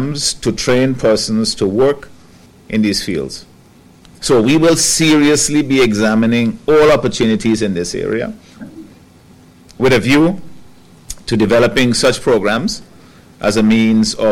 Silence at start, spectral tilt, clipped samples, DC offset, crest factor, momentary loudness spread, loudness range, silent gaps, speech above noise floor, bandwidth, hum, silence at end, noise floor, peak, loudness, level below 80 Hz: 0 s; -4.5 dB/octave; under 0.1%; under 0.1%; 10 dB; 13 LU; 6 LU; none; 31 dB; 16.5 kHz; none; 0 s; -44 dBFS; -4 dBFS; -13 LUFS; -38 dBFS